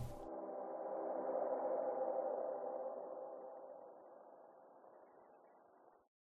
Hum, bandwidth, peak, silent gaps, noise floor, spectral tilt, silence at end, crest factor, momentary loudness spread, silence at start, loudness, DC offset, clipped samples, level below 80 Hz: none; 2.4 kHz; -30 dBFS; none; -68 dBFS; -4 dB/octave; 0.5 s; 16 dB; 22 LU; 0 s; -44 LUFS; under 0.1%; under 0.1%; -68 dBFS